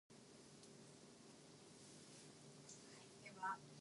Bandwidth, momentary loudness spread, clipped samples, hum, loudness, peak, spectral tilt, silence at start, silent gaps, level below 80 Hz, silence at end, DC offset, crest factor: 11.5 kHz; 14 LU; under 0.1%; none; -57 LUFS; -36 dBFS; -3 dB/octave; 0.1 s; none; -90 dBFS; 0 s; under 0.1%; 22 dB